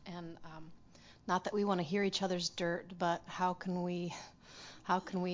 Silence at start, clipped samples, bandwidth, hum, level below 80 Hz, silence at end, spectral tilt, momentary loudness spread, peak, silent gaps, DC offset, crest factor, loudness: 0 s; under 0.1%; 7.6 kHz; none; -70 dBFS; 0 s; -5 dB/octave; 18 LU; -18 dBFS; none; under 0.1%; 20 dB; -36 LUFS